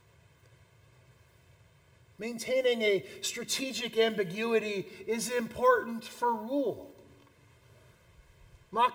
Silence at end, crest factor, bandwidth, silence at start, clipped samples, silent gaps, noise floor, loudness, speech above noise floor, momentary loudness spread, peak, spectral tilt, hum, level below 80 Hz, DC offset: 0 s; 20 dB; 18 kHz; 2.2 s; under 0.1%; none; -62 dBFS; -31 LUFS; 31 dB; 11 LU; -14 dBFS; -3 dB/octave; none; -68 dBFS; under 0.1%